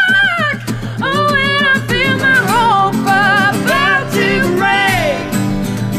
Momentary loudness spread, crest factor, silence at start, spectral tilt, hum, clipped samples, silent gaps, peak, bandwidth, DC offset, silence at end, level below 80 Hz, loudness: 7 LU; 12 dB; 0 s; -4.5 dB/octave; none; under 0.1%; none; 0 dBFS; 16 kHz; under 0.1%; 0 s; -34 dBFS; -12 LUFS